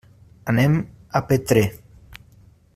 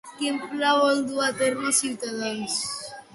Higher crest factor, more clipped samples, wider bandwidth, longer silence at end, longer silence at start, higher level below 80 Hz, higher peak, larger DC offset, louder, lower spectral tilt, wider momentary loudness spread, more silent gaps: about the same, 20 dB vs 16 dB; neither; first, 15.5 kHz vs 12 kHz; first, 1 s vs 0.1 s; first, 0.45 s vs 0.05 s; first, -48 dBFS vs -70 dBFS; first, -2 dBFS vs -10 dBFS; neither; first, -21 LUFS vs -24 LUFS; first, -6.5 dB/octave vs -2 dB/octave; about the same, 8 LU vs 9 LU; neither